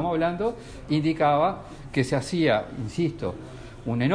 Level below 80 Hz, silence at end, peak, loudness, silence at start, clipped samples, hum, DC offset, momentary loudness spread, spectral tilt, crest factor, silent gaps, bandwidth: -48 dBFS; 0 s; -10 dBFS; -26 LUFS; 0 s; under 0.1%; none; under 0.1%; 15 LU; -6.5 dB/octave; 16 dB; none; 10.5 kHz